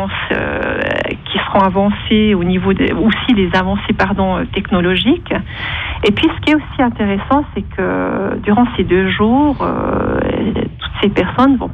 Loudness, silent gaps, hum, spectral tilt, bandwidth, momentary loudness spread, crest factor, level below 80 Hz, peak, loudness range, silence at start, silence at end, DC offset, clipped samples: -15 LUFS; none; none; -7.5 dB/octave; 7.4 kHz; 6 LU; 14 dB; -32 dBFS; 0 dBFS; 2 LU; 0 s; 0 s; under 0.1%; under 0.1%